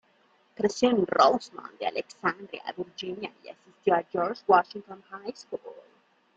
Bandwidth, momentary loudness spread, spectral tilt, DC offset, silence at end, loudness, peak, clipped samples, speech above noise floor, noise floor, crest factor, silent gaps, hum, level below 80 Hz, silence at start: 8.4 kHz; 19 LU; -4.5 dB/octave; under 0.1%; 0.55 s; -27 LUFS; -6 dBFS; under 0.1%; 37 dB; -65 dBFS; 22 dB; none; none; -72 dBFS; 0.6 s